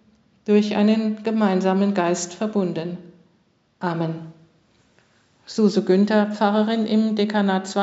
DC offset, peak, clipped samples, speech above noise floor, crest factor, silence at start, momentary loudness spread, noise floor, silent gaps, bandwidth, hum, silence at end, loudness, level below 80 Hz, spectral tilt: under 0.1%; -4 dBFS; under 0.1%; 43 dB; 18 dB; 0.45 s; 12 LU; -63 dBFS; none; 8 kHz; none; 0 s; -21 LUFS; -72 dBFS; -6 dB/octave